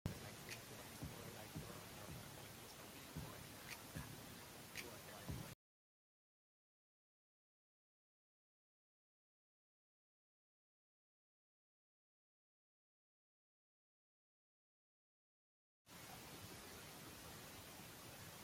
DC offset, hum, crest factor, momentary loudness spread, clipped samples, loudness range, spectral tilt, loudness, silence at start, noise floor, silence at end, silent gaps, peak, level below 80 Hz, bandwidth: under 0.1%; none; 30 dB; 4 LU; under 0.1%; 8 LU; -3.5 dB/octave; -54 LUFS; 0.05 s; under -90 dBFS; 0 s; 5.55-15.85 s; -28 dBFS; -72 dBFS; 16.5 kHz